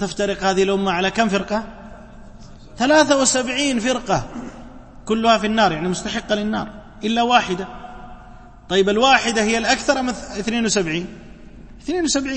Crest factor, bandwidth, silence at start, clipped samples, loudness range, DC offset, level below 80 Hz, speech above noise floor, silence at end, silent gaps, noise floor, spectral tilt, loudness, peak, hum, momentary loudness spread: 20 dB; 8.8 kHz; 0 s; under 0.1%; 3 LU; under 0.1%; -42 dBFS; 22 dB; 0 s; none; -41 dBFS; -3.5 dB/octave; -19 LUFS; 0 dBFS; none; 18 LU